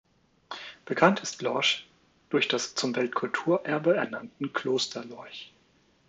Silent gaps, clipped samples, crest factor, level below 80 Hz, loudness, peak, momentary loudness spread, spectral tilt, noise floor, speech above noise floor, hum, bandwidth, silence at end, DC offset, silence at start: none; under 0.1%; 24 dB; -76 dBFS; -27 LUFS; -6 dBFS; 17 LU; -3.5 dB/octave; -65 dBFS; 37 dB; none; 9.4 kHz; 0.6 s; under 0.1%; 0.5 s